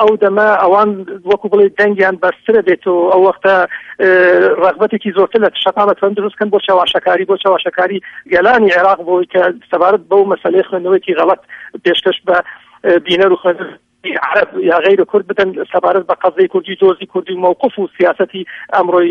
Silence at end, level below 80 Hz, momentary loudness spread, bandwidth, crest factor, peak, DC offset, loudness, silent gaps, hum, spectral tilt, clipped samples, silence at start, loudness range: 0 s; -56 dBFS; 7 LU; 6.4 kHz; 12 dB; 0 dBFS; under 0.1%; -12 LUFS; none; none; -6.5 dB/octave; under 0.1%; 0 s; 3 LU